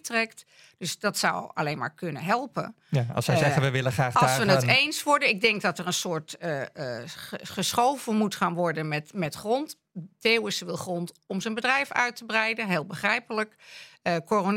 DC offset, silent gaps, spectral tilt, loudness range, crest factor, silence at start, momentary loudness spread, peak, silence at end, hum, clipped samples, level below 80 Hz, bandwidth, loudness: under 0.1%; none; -4 dB/octave; 5 LU; 20 dB; 0.05 s; 12 LU; -6 dBFS; 0 s; none; under 0.1%; -66 dBFS; 16.5 kHz; -26 LUFS